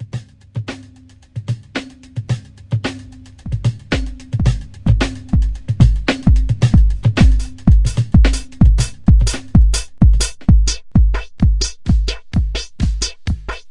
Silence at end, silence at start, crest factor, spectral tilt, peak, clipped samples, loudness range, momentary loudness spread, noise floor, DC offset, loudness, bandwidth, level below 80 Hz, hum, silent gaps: 0 s; 0 s; 14 dB; -5.5 dB/octave; 0 dBFS; under 0.1%; 10 LU; 14 LU; -43 dBFS; under 0.1%; -17 LUFS; 11.5 kHz; -16 dBFS; none; none